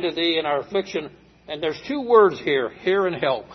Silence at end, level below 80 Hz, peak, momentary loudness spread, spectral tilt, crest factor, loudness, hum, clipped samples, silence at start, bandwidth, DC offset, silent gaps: 0 s; -60 dBFS; -2 dBFS; 14 LU; -5.5 dB/octave; 20 dB; -22 LUFS; none; under 0.1%; 0 s; 6.2 kHz; under 0.1%; none